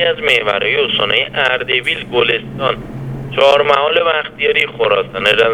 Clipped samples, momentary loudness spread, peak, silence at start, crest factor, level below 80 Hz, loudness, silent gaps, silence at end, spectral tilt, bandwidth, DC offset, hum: under 0.1%; 7 LU; 0 dBFS; 0 s; 14 dB; -44 dBFS; -13 LUFS; none; 0 s; -4.5 dB/octave; 14 kHz; under 0.1%; none